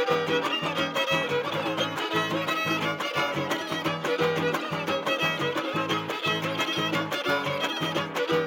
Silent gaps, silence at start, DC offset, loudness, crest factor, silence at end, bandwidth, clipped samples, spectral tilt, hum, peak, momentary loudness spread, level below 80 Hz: none; 0 s; under 0.1%; -27 LUFS; 16 dB; 0 s; 17 kHz; under 0.1%; -4 dB/octave; none; -10 dBFS; 3 LU; -70 dBFS